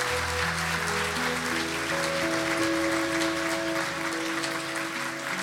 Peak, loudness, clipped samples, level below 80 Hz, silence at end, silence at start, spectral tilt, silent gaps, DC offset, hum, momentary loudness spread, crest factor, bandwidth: -12 dBFS; -27 LUFS; under 0.1%; -56 dBFS; 0 s; 0 s; -3 dB/octave; none; under 0.1%; none; 4 LU; 16 dB; 17.5 kHz